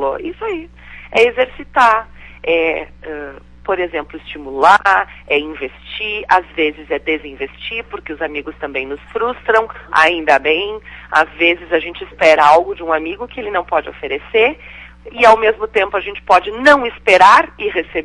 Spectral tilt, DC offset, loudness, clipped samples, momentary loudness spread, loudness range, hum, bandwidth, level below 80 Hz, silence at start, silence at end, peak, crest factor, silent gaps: -3.5 dB/octave; under 0.1%; -14 LUFS; under 0.1%; 17 LU; 7 LU; 60 Hz at -45 dBFS; 11.5 kHz; -42 dBFS; 0 s; 0 s; 0 dBFS; 16 dB; none